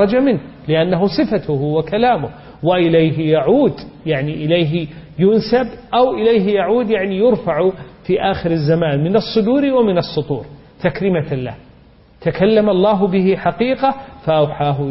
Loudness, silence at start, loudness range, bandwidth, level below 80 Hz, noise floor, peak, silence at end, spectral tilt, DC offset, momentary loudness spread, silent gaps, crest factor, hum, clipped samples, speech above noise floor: -16 LUFS; 0 s; 2 LU; 5.8 kHz; -44 dBFS; -46 dBFS; -2 dBFS; 0 s; -11 dB/octave; under 0.1%; 8 LU; none; 14 dB; none; under 0.1%; 31 dB